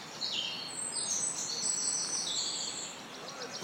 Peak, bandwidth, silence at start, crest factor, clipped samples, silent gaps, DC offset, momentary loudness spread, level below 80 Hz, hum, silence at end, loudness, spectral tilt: -20 dBFS; 16.5 kHz; 0 s; 16 dB; under 0.1%; none; under 0.1%; 11 LU; -82 dBFS; none; 0 s; -33 LUFS; 0.5 dB/octave